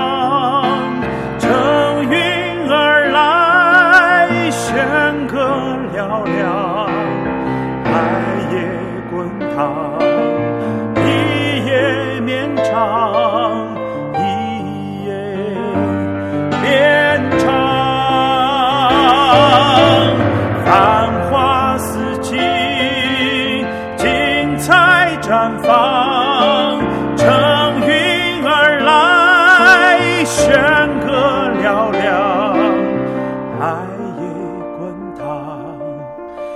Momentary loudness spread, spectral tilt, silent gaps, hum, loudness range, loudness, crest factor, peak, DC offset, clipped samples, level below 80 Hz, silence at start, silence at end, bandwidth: 13 LU; -5 dB/octave; none; none; 8 LU; -13 LUFS; 14 dB; 0 dBFS; under 0.1%; under 0.1%; -42 dBFS; 0 s; 0 s; 15 kHz